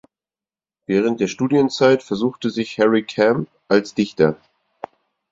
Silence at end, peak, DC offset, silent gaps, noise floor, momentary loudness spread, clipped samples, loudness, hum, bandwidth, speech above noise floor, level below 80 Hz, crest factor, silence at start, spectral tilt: 0.95 s; -2 dBFS; under 0.1%; none; under -90 dBFS; 21 LU; under 0.1%; -19 LUFS; none; 7.8 kHz; over 72 dB; -58 dBFS; 18 dB; 0.9 s; -6 dB/octave